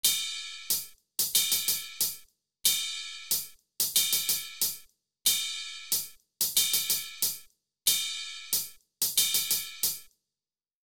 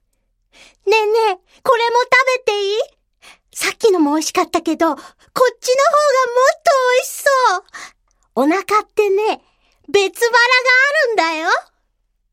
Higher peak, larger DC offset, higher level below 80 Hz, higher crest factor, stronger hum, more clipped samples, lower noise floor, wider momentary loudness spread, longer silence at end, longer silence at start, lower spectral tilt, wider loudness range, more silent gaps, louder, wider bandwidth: second, -10 dBFS vs -2 dBFS; first, 0.1% vs under 0.1%; second, -70 dBFS vs -62 dBFS; about the same, 20 dB vs 16 dB; neither; neither; first, under -90 dBFS vs -66 dBFS; about the same, 12 LU vs 10 LU; about the same, 0.8 s vs 0.7 s; second, 0.05 s vs 0.85 s; second, 2.5 dB/octave vs -1.5 dB/octave; about the same, 1 LU vs 3 LU; neither; second, -27 LUFS vs -15 LUFS; first, over 20 kHz vs 16 kHz